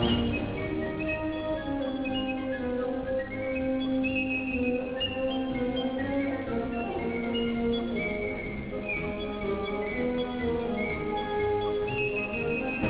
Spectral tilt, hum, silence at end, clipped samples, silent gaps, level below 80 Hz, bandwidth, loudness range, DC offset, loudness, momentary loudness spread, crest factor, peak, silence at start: -4 dB/octave; none; 0 s; under 0.1%; none; -46 dBFS; 4 kHz; 2 LU; under 0.1%; -30 LUFS; 4 LU; 16 dB; -14 dBFS; 0 s